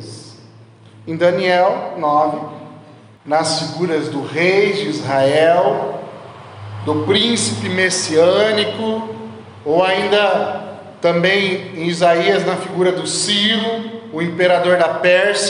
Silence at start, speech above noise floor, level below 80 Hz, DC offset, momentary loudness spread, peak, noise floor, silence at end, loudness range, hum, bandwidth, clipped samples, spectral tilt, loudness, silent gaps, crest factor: 0 s; 27 dB; -68 dBFS; under 0.1%; 16 LU; -2 dBFS; -43 dBFS; 0 s; 2 LU; none; 11 kHz; under 0.1%; -4 dB/octave; -16 LUFS; none; 14 dB